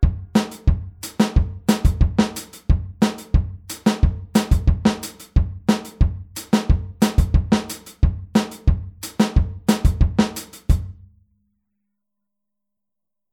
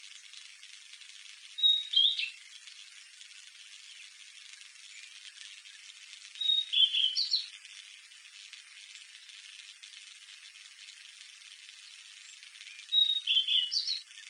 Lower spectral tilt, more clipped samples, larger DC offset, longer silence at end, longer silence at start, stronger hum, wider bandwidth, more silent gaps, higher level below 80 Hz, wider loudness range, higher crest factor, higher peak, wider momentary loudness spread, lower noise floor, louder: first, -6 dB/octave vs 10.5 dB/octave; neither; neither; first, 2.4 s vs 0 s; about the same, 0 s vs 0.05 s; neither; first, 19 kHz vs 11 kHz; neither; first, -24 dBFS vs under -90 dBFS; second, 2 LU vs 18 LU; about the same, 18 dB vs 22 dB; first, -2 dBFS vs -14 dBFS; second, 6 LU vs 24 LU; first, -87 dBFS vs -53 dBFS; first, -21 LUFS vs -26 LUFS